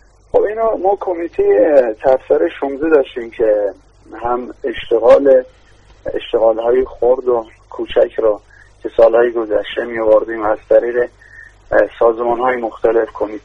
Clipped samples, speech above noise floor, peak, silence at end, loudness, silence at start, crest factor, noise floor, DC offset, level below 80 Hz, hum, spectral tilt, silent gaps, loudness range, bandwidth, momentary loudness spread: under 0.1%; 26 dB; 0 dBFS; 0.05 s; -15 LUFS; 0.35 s; 14 dB; -40 dBFS; under 0.1%; -44 dBFS; none; -6.5 dB/octave; none; 2 LU; 6 kHz; 12 LU